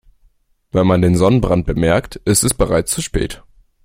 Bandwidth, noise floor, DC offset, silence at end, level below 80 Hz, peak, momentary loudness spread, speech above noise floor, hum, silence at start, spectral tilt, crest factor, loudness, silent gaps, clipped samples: 16.5 kHz; -56 dBFS; under 0.1%; 0.5 s; -30 dBFS; 0 dBFS; 9 LU; 41 dB; none; 0.75 s; -5 dB/octave; 16 dB; -16 LUFS; none; under 0.1%